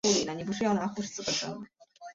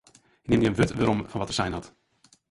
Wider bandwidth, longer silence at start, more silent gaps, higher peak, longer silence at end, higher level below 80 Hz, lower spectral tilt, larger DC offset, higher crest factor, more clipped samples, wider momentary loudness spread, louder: second, 7.8 kHz vs 11.5 kHz; second, 0.05 s vs 0.45 s; neither; second, -12 dBFS vs -8 dBFS; second, 0 s vs 0.65 s; second, -64 dBFS vs -48 dBFS; second, -3.5 dB/octave vs -6 dB/octave; neither; about the same, 20 dB vs 20 dB; neither; first, 18 LU vs 11 LU; second, -31 LUFS vs -26 LUFS